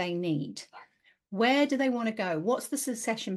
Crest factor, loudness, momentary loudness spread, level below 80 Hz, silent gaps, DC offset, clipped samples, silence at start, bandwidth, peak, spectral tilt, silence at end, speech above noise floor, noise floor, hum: 16 dB; -29 LUFS; 15 LU; -80 dBFS; none; under 0.1%; under 0.1%; 0 s; 12.5 kHz; -14 dBFS; -4.5 dB/octave; 0 s; 32 dB; -61 dBFS; none